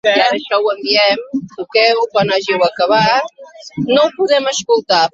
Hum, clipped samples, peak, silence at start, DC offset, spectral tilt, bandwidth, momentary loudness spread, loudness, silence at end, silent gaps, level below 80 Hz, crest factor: none; under 0.1%; 0 dBFS; 0.05 s; under 0.1%; -3.5 dB/octave; 7.8 kHz; 9 LU; -14 LUFS; 0.05 s; none; -60 dBFS; 14 dB